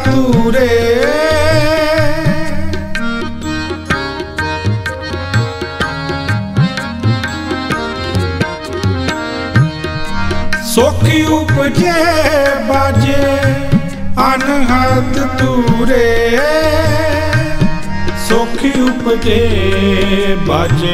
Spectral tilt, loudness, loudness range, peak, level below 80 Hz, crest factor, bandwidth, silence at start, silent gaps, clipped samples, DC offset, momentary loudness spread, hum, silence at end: -6 dB/octave; -13 LUFS; 5 LU; 0 dBFS; -24 dBFS; 12 dB; 15.5 kHz; 0 s; none; under 0.1%; under 0.1%; 8 LU; none; 0 s